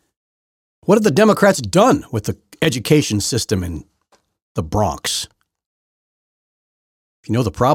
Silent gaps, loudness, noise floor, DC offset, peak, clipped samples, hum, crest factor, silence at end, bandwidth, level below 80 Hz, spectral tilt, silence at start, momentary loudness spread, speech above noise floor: 4.42-4.55 s, 5.66-7.23 s; -17 LUFS; -61 dBFS; under 0.1%; 0 dBFS; under 0.1%; none; 18 dB; 0 s; 17 kHz; -44 dBFS; -5 dB/octave; 0.85 s; 15 LU; 45 dB